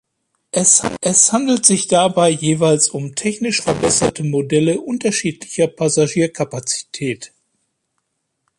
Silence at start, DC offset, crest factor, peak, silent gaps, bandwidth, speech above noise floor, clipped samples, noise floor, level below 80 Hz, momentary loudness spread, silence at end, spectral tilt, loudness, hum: 0.55 s; under 0.1%; 18 dB; 0 dBFS; none; 11.5 kHz; 55 dB; under 0.1%; -72 dBFS; -52 dBFS; 10 LU; 1.35 s; -3.5 dB/octave; -16 LUFS; none